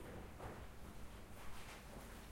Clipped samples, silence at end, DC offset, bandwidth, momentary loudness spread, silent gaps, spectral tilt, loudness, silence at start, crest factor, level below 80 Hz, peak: under 0.1%; 0 s; under 0.1%; 16.5 kHz; 4 LU; none; -4.5 dB/octave; -55 LUFS; 0 s; 14 dB; -58 dBFS; -38 dBFS